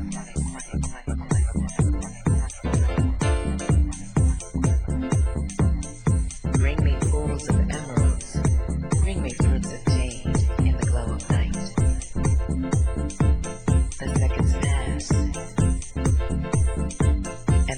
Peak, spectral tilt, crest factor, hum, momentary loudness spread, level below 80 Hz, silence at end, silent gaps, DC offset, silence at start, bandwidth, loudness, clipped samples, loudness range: -8 dBFS; -6.5 dB/octave; 14 dB; none; 4 LU; -26 dBFS; 0 s; none; under 0.1%; 0 s; 10 kHz; -24 LUFS; under 0.1%; 1 LU